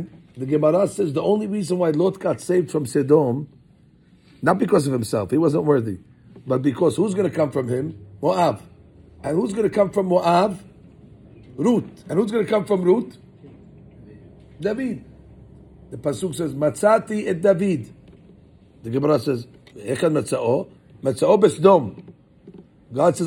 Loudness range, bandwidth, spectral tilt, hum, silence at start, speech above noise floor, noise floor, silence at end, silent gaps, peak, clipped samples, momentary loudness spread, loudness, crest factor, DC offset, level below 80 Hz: 4 LU; 17 kHz; -7 dB/octave; none; 0 s; 34 dB; -53 dBFS; 0 s; none; 0 dBFS; under 0.1%; 14 LU; -21 LUFS; 20 dB; under 0.1%; -58 dBFS